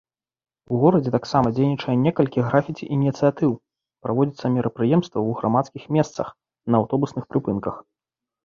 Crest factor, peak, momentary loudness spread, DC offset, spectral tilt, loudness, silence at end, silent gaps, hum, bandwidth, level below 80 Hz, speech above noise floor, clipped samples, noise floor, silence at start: 20 dB; -2 dBFS; 8 LU; under 0.1%; -8.5 dB/octave; -22 LUFS; 0.65 s; none; none; 7.2 kHz; -56 dBFS; 67 dB; under 0.1%; -88 dBFS; 0.7 s